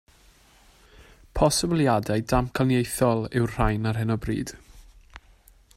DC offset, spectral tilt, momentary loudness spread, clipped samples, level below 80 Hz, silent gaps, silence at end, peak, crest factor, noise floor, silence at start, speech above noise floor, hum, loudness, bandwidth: under 0.1%; -5.5 dB/octave; 7 LU; under 0.1%; -40 dBFS; none; 0.6 s; -6 dBFS; 20 dB; -56 dBFS; 1 s; 33 dB; none; -24 LUFS; 16 kHz